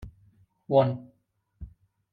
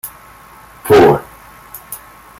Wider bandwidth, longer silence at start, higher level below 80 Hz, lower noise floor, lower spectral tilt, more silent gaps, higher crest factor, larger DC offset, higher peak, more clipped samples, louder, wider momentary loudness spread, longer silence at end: second, 4.8 kHz vs 16.5 kHz; about the same, 0 s vs 0.05 s; second, -54 dBFS vs -44 dBFS; first, -72 dBFS vs -40 dBFS; first, -10 dB/octave vs -5.5 dB/octave; neither; about the same, 20 dB vs 16 dB; neither; second, -10 dBFS vs 0 dBFS; neither; second, -26 LUFS vs -10 LUFS; about the same, 25 LU vs 24 LU; about the same, 0.45 s vs 0.45 s